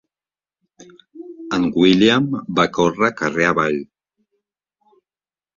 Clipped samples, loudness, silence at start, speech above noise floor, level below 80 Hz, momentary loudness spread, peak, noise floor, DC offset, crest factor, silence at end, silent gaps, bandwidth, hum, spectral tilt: under 0.1%; -17 LUFS; 0.8 s; over 73 dB; -54 dBFS; 12 LU; -2 dBFS; under -90 dBFS; under 0.1%; 20 dB; 1.75 s; none; 7.4 kHz; none; -5.5 dB/octave